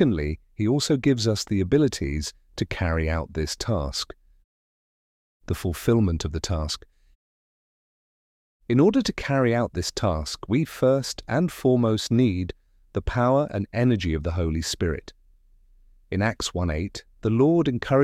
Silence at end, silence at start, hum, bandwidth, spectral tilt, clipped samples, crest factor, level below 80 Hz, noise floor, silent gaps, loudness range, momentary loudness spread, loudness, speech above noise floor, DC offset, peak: 0 s; 0 s; none; 16 kHz; -6 dB/octave; under 0.1%; 18 dB; -38 dBFS; -56 dBFS; 4.44-5.40 s, 7.15-8.60 s; 5 LU; 10 LU; -24 LUFS; 33 dB; under 0.1%; -6 dBFS